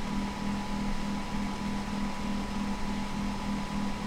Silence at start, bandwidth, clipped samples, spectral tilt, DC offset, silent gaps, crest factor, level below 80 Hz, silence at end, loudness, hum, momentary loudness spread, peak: 0 s; 15 kHz; under 0.1%; -5.5 dB/octave; under 0.1%; none; 12 dB; -40 dBFS; 0 s; -34 LUFS; none; 1 LU; -20 dBFS